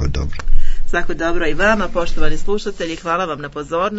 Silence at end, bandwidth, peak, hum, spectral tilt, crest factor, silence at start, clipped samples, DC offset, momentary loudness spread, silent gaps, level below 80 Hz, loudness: 0 s; 7.8 kHz; 0 dBFS; none; -5.5 dB/octave; 12 dB; 0 s; 0.2%; under 0.1%; 9 LU; none; -20 dBFS; -20 LUFS